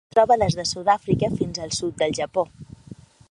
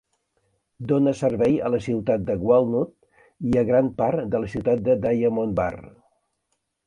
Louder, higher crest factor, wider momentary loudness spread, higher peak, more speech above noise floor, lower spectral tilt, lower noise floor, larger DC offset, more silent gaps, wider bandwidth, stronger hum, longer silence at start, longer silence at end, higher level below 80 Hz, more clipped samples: about the same, -22 LUFS vs -22 LUFS; about the same, 18 dB vs 18 dB; about the same, 9 LU vs 7 LU; about the same, -4 dBFS vs -6 dBFS; second, 23 dB vs 54 dB; second, -5 dB/octave vs -8.5 dB/octave; second, -45 dBFS vs -75 dBFS; neither; neither; first, 11.5 kHz vs 9.8 kHz; neither; second, 0.15 s vs 0.8 s; second, 0.35 s vs 1 s; about the same, -48 dBFS vs -50 dBFS; neither